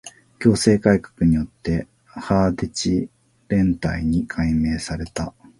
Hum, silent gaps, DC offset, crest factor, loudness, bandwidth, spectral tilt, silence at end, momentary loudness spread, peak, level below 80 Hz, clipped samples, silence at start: none; none; under 0.1%; 20 dB; -21 LUFS; 11.5 kHz; -6 dB/octave; 0.3 s; 11 LU; -2 dBFS; -36 dBFS; under 0.1%; 0.05 s